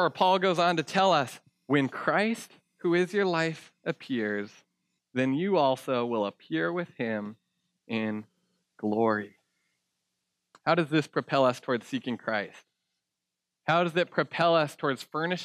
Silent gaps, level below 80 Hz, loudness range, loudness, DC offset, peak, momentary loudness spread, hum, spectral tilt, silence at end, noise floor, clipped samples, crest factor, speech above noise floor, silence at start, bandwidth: none; -86 dBFS; 6 LU; -28 LUFS; under 0.1%; -10 dBFS; 12 LU; none; -5.5 dB/octave; 0 s; -86 dBFS; under 0.1%; 20 dB; 59 dB; 0 s; 14.5 kHz